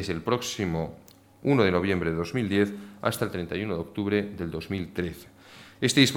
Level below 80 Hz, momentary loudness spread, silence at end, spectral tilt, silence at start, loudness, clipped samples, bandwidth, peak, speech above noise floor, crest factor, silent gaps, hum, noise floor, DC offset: -52 dBFS; 11 LU; 0 s; -5 dB/octave; 0 s; -28 LUFS; under 0.1%; 17.5 kHz; -6 dBFS; 23 dB; 22 dB; none; none; -50 dBFS; under 0.1%